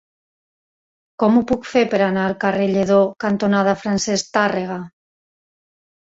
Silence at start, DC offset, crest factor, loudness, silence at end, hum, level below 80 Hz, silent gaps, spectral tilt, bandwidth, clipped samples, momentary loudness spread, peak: 1.2 s; under 0.1%; 18 dB; -18 LUFS; 1.15 s; none; -54 dBFS; none; -5.5 dB/octave; 8 kHz; under 0.1%; 5 LU; -2 dBFS